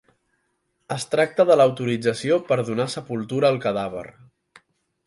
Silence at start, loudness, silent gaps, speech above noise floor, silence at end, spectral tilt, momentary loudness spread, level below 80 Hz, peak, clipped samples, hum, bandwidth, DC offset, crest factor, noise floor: 0.9 s; -22 LUFS; none; 50 dB; 1 s; -5.5 dB/octave; 14 LU; -64 dBFS; -4 dBFS; under 0.1%; none; 11.5 kHz; under 0.1%; 18 dB; -72 dBFS